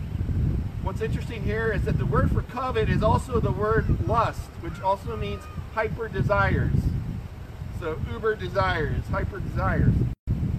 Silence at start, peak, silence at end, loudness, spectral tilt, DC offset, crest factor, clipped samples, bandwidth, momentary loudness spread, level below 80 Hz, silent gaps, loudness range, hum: 0 s; -8 dBFS; 0 s; -26 LUFS; -8 dB/octave; under 0.1%; 16 dB; under 0.1%; 14.5 kHz; 9 LU; -32 dBFS; 10.19-10.27 s; 3 LU; none